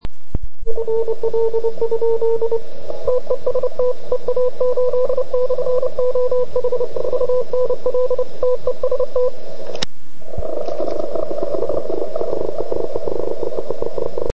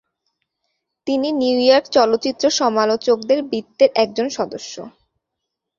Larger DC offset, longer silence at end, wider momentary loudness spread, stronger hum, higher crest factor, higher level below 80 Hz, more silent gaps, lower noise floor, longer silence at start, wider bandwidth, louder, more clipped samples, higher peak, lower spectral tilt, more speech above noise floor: first, 20% vs under 0.1%; second, 0 s vs 0.9 s; second, 8 LU vs 12 LU; neither; about the same, 16 dB vs 18 dB; first, -38 dBFS vs -64 dBFS; neither; second, -40 dBFS vs -80 dBFS; second, 0 s vs 1.05 s; first, 8.4 kHz vs 7.4 kHz; second, -21 LUFS vs -17 LUFS; neither; about the same, 0 dBFS vs -2 dBFS; first, -6.5 dB/octave vs -3 dB/octave; second, 21 dB vs 63 dB